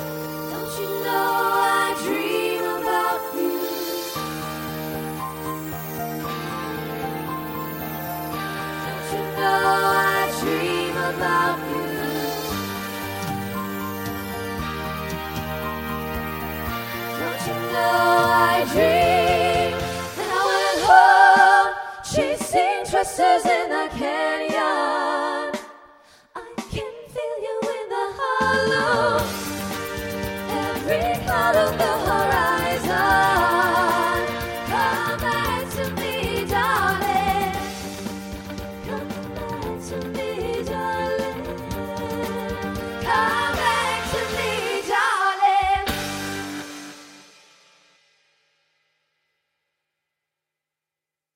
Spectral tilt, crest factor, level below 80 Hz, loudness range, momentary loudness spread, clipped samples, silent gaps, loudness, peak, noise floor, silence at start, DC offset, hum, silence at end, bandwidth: -4 dB/octave; 22 dB; -44 dBFS; 12 LU; 12 LU; under 0.1%; none; -22 LUFS; 0 dBFS; -88 dBFS; 0 s; under 0.1%; none; 4.15 s; 17 kHz